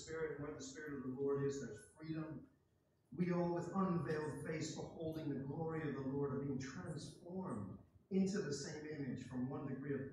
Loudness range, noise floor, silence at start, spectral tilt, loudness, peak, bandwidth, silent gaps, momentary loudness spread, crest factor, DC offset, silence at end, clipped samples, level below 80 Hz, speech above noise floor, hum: 3 LU; -78 dBFS; 0 s; -6.5 dB/octave; -44 LUFS; -26 dBFS; 12 kHz; none; 10 LU; 16 dB; under 0.1%; 0 s; under 0.1%; -72 dBFS; 35 dB; none